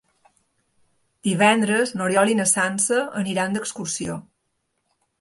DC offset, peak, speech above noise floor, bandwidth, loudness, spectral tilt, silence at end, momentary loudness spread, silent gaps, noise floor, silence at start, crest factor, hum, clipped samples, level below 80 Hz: under 0.1%; -4 dBFS; 53 dB; 12 kHz; -21 LUFS; -3.5 dB/octave; 1 s; 11 LU; none; -74 dBFS; 1.25 s; 20 dB; none; under 0.1%; -64 dBFS